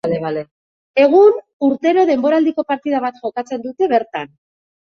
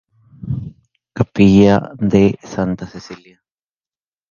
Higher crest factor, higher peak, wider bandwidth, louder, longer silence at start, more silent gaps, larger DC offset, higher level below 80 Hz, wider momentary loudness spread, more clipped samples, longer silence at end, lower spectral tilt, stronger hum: about the same, 14 dB vs 16 dB; about the same, -2 dBFS vs 0 dBFS; about the same, 6.8 kHz vs 7.2 kHz; about the same, -16 LUFS vs -15 LUFS; second, 0.05 s vs 0.45 s; first, 0.51-0.94 s, 1.53-1.60 s vs none; neither; second, -62 dBFS vs -40 dBFS; second, 15 LU vs 25 LU; neither; second, 0.7 s vs 1.15 s; about the same, -7 dB/octave vs -8 dB/octave; neither